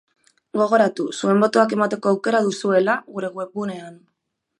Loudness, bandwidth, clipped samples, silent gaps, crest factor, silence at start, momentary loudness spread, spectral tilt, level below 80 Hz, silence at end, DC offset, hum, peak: -20 LUFS; 11 kHz; under 0.1%; none; 18 dB; 0.55 s; 12 LU; -5.5 dB/octave; -72 dBFS; 0.65 s; under 0.1%; none; -2 dBFS